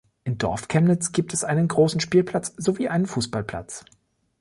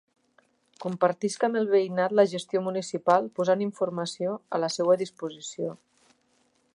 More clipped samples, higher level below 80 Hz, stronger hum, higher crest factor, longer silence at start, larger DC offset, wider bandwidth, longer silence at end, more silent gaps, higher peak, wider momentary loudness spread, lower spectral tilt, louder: neither; first, -52 dBFS vs -80 dBFS; neither; about the same, 16 dB vs 20 dB; second, 0.25 s vs 0.8 s; neither; about the same, 11.5 kHz vs 11 kHz; second, 0.6 s vs 1 s; neither; about the same, -6 dBFS vs -8 dBFS; about the same, 12 LU vs 11 LU; about the same, -5.5 dB/octave vs -5 dB/octave; first, -23 LUFS vs -27 LUFS